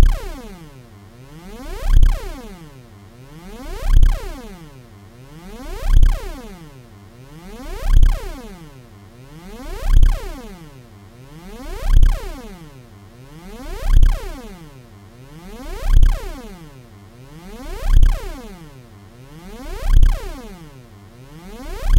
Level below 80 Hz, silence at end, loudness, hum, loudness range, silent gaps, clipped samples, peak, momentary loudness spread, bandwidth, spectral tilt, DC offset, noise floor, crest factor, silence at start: -18 dBFS; 0 s; -22 LUFS; none; 3 LU; none; under 0.1%; 0 dBFS; 24 LU; 10.5 kHz; -6 dB/octave; under 0.1%; -41 dBFS; 18 dB; 0 s